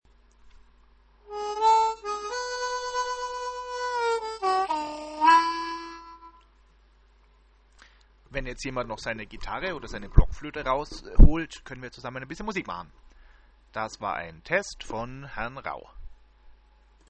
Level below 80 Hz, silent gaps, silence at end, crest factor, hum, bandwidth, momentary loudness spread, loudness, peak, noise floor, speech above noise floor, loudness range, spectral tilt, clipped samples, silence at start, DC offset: -30 dBFS; none; 0.6 s; 26 dB; none; 8.8 kHz; 16 LU; -28 LUFS; 0 dBFS; -59 dBFS; 35 dB; 10 LU; -5 dB/octave; under 0.1%; 0.45 s; under 0.1%